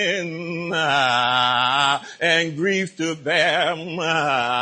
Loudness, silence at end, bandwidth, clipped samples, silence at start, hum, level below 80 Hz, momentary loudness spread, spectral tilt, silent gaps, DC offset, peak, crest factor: -20 LUFS; 0 s; 10.5 kHz; under 0.1%; 0 s; none; -64 dBFS; 8 LU; -3.5 dB/octave; none; under 0.1%; -6 dBFS; 16 dB